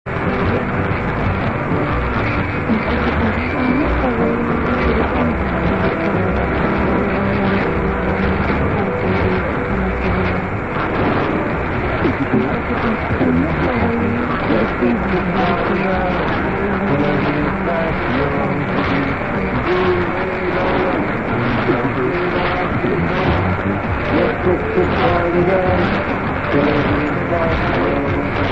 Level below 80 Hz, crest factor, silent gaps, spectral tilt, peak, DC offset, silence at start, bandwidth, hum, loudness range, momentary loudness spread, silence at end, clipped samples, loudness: -30 dBFS; 14 dB; none; -8.5 dB/octave; -2 dBFS; 0.6%; 0.05 s; 8 kHz; none; 2 LU; 3 LU; 0 s; under 0.1%; -17 LUFS